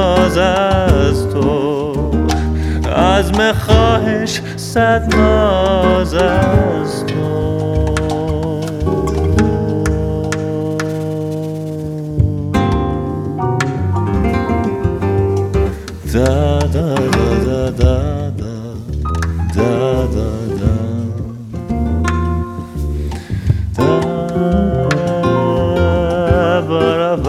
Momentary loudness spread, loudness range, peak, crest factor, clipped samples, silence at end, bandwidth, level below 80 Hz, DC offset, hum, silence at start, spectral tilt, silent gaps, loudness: 9 LU; 5 LU; 0 dBFS; 14 dB; under 0.1%; 0 s; 14 kHz; -24 dBFS; under 0.1%; none; 0 s; -6.5 dB/octave; none; -15 LUFS